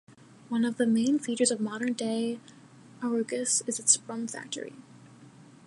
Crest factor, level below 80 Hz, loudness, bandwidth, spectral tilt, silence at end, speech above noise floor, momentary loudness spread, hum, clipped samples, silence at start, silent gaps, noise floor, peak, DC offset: 22 dB; -80 dBFS; -28 LUFS; 11.5 kHz; -3 dB/octave; 0.2 s; 24 dB; 13 LU; none; under 0.1%; 0.1 s; none; -53 dBFS; -8 dBFS; under 0.1%